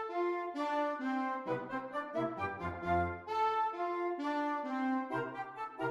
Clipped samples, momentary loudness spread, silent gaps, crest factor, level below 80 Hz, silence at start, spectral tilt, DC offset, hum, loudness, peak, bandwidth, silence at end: under 0.1%; 6 LU; none; 14 dB; -64 dBFS; 0 s; -7 dB/octave; under 0.1%; none; -36 LUFS; -22 dBFS; 12 kHz; 0 s